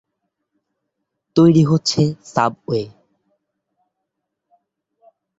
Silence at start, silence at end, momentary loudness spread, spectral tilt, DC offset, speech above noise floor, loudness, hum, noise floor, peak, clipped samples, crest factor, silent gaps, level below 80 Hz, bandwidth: 1.35 s; 2.5 s; 12 LU; -6.5 dB/octave; under 0.1%; 63 dB; -17 LUFS; none; -78 dBFS; -2 dBFS; under 0.1%; 20 dB; none; -56 dBFS; 8 kHz